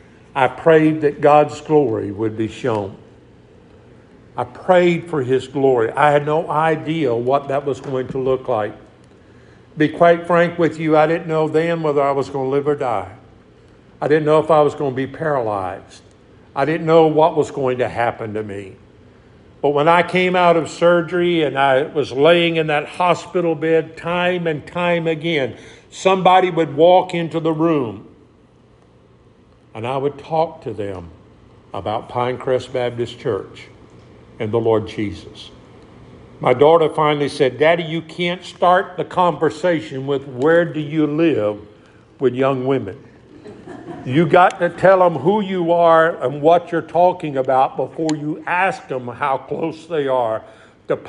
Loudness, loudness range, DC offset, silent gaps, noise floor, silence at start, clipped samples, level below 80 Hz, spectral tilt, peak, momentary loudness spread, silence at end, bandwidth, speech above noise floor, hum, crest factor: -17 LUFS; 8 LU; under 0.1%; none; -50 dBFS; 0.35 s; under 0.1%; -56 dBFS; -6.5 dB/octave; 0 dBFS; 13 LU; 0 s; 10.5 kHz; 33 dB; none; 18 dB